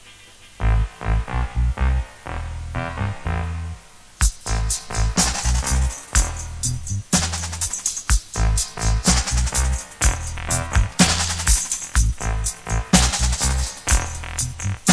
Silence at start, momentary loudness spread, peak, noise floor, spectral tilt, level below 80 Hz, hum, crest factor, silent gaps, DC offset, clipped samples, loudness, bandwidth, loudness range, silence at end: 0.05 s; 9 LU; 0 dBFS; -45 dBFS; -3 dB/octave; -24 dBFS; none; 20 dB; none; 0.1%; under 0.1%; -22 LUFS; 11 kHz; 6 LU; 0 s